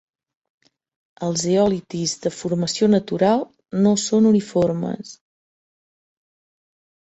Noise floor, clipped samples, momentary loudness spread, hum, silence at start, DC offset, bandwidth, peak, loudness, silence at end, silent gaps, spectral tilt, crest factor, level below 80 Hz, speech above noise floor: under -90 dBFS; under 0.1%; 11 LU; none; 1.2 s; under 0.1%; 8.2 kHz; -4 dBFS; -20 LUFS; 1.85 s; none; -5.5 dB/octave; 16 dB; -60 dBFS; over 71 dB